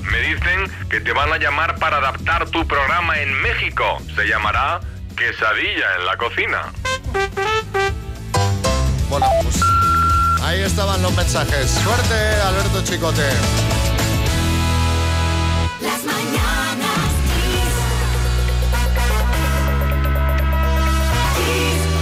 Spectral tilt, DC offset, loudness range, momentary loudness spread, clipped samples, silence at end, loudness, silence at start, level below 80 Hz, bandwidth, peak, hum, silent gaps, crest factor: -4.5 dB/octave; under 0.1%; 3 LU; 4 LU; under 0.1%; 0 s; -18 LUFS; 0 s; -24 dBFS; 16 kHz; -8 dBFS; none; none; 10 dB